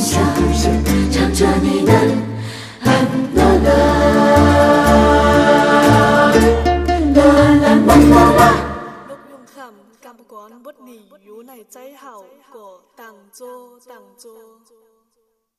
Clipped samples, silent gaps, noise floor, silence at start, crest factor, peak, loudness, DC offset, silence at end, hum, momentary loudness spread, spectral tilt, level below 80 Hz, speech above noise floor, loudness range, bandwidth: under 0.1%; none; -67 dBFS; 0 s; 14 dB; 0 dBFS; -12 LUFS; under 0.1%; 2 s; none; 9 LU; -6 dB/octave; -26 dBFS; 48 dB; 5 LU; 15.5 kHz